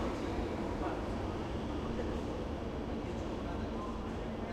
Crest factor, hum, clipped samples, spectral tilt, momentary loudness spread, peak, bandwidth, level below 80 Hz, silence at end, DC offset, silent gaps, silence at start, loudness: 14 dB; none; under 0.1%; -7 dB/octave; 3 LU; -24 dBFS; 13 kHz; -44 dBFS; 0 s; under 0.1%; none; 0 s; -39 LUFS